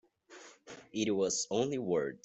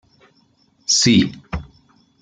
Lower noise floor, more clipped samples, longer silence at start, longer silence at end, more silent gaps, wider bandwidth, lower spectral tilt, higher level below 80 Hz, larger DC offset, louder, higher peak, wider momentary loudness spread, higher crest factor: about the same, -56 dBFS vs -59 dBFS; neither; second, 0.3 s vs 0.9 s; second, 0.05 s vs 0.6 s; neither; second, 8.2 kHz vs 9.6 kHz; about the same, -4 dB/octave vs -3 dB/octave; second, -76 dBFS vs -44 dBFS; neither; second, -33 LUFS vs -15 LUFS; second, -18 dBFS vs -2 dBFS; first, 21 LU vs 18 LU; about the same, 18 dB vs 18 dB